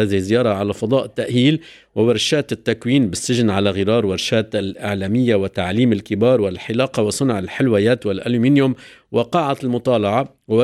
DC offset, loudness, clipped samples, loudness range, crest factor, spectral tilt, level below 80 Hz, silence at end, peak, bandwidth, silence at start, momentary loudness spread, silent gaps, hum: under 0.1%; -18 LUFS; under 0.1%; 1 LU; 14 dB; -5.5 dB/octave; -54 dBFS; 0 s; -4 dBFS; 14 kHz; 0 s; 6 LU; none; none